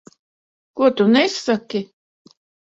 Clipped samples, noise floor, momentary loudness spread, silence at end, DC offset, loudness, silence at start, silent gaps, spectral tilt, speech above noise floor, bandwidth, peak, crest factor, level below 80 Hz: under 0.1%; under -90 dBFS; 18 LU; 0.85 s; under 0.1%; -18 LUFS; 0.75 s; none; -5 dB/octave; over 73 dB; 8 kHz; -2 dBFS; 18 dB; -66 dBFS